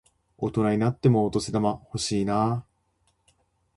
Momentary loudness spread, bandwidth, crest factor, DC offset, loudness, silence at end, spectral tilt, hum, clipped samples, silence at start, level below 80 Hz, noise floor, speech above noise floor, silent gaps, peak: 8 LU; 11.5 kHz; 18 dB; under 0.1%; -25 LUFS; 1.15 s; -6.5 dB/octave; none; under 0.1%; 0.4 s; -54 dBFS; -70 dBFS; 46 dB; none; -8 dBFS